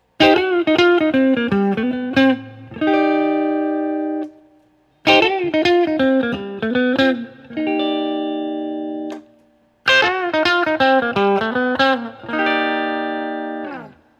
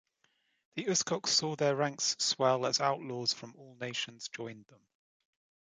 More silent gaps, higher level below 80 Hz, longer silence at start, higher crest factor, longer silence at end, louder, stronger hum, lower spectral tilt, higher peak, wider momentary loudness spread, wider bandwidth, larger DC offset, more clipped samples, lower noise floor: neither; first, -56 dBFS vs -80 dBFS; second, 0.2 s vs 0.75 s; about the same, 18 dB vs 20 dB; second, 0.3 s vs 1.15 s; first, -17 LUFS vs -32 LUFS; neither; first, -5 dB/octave vs -2.5 dB/octave; first, 0 dBFS vs -14 dBFS; second, 12 LU vs 15 LU; second, 8.4 kHz vs 11 kHz; neither; neither; second, -56 dBFS vs -75 dBFS